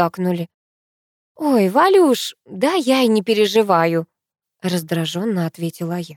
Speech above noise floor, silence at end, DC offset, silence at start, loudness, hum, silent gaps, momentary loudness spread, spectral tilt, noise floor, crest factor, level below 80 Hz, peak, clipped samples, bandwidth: over 73 dB; 0.05 s; under 0.1%; 0 s; -18 LUFS; none; 0.54-1.35 s; 12 LU; -5.5 dB/octave; under -90 dBFS; 16 dB; -72 dBFS; -2 dBFS; under 0.1%; 17.5 kHz